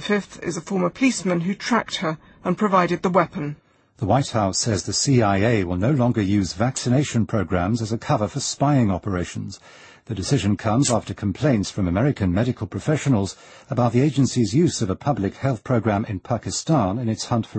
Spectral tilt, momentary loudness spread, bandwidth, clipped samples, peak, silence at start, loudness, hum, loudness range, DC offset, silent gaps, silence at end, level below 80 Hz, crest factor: -5.5 dB/octave; 9 LU; 8.8 kHz; under 0.1%; -4 dBFS; 0 s; -22 LUFS; none; 2 LU; under 0.1%; none; 0 s; -48 dBFS; 16 dB